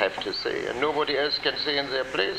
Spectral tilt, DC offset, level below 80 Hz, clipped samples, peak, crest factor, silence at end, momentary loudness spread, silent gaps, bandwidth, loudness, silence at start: -3.5 dB/octave; under 0.1%; -56 dBFS; under 0.1%; -6 dBFS; 20 dB; 0 s; 4 LU; none; 15 kHz; -26 LUFS; 0 s